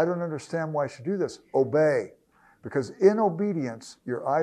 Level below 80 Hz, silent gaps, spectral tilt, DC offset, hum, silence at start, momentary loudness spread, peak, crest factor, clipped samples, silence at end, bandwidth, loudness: -72 dBFS; none; -7 dB/octave; under 0.1%; none; 0 s; 12 LU; -6 dBFS; 20 dB; under 0.1%; 0 s; 10 kHz; -26 LUFS